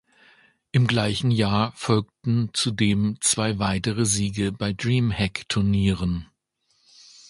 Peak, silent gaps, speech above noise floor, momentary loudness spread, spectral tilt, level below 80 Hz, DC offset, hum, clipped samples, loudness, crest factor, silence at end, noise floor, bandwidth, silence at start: -6 dBFS; none; 47 dB; 5 LU; -4.5 dB/octave; -44 dBFS; under 0.1%; none; under 0.1%; -23 LUFS; 18 dB; 1.05 s; -69 dBFS; 11.5 kHz; 0.75 s